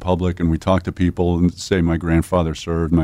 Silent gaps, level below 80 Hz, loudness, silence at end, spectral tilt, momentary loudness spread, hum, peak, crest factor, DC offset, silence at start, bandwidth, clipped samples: none; -32 dBFS; -19 LUFS; 0 s; -7 dB/octave; 3 LU; none; -6 dBFS; 12 dB; under 0.1%; 0 s; 13 kHz; under 0.1%